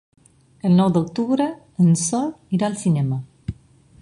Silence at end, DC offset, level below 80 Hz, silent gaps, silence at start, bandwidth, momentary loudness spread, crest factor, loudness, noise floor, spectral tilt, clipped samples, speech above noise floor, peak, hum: 0.5 s; under 0.1%; -50 dBFS; none; 0.65 s; 11.5 kHz; 11 LU; 16 dB; -20 LUFS; -49 dBFS; -6.5 dB/octave; under 0.1%; 30 dB; -4 dBFS; none